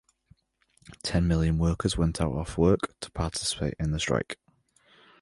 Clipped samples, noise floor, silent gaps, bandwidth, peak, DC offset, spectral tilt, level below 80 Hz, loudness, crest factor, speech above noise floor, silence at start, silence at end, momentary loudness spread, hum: under 0.1%; -68 dBFS; none; 11.5 kHz; -8 dBFS; under 0.1%; -5.5 dB/octave; -38 dBFS; -28 LUFS; 20 dB; 41 dB; 0.9 s; 0.9 s; 10 LU; none